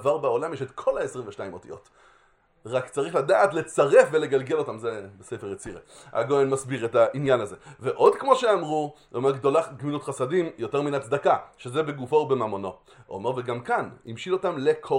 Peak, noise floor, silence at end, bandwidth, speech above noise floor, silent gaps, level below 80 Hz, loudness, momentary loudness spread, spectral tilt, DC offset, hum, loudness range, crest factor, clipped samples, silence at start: -2 dBFS; -62 dBFS; 0 s; 11.5 kHz; 37 dB; none; -64 dBFS; -25 LUFS; 16 LU; -5.5 dB/octave; under 0.1%; none; 4 LU; 22 dB; under 0.1%; 0 s